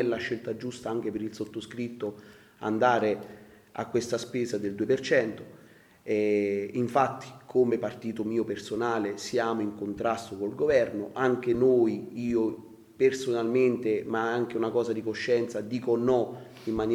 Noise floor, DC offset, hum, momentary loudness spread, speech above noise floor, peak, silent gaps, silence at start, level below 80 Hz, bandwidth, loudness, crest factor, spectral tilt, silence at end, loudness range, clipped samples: -54 dBFS; under 0.1%; none; 11 LU; 27 dB; -8 dBFS; none; 0 s; -62 dBFS; 14 kHz; -28 LUFS; 20 dB; -6 dB/octave; 0 s; 4 LU; under 0.1%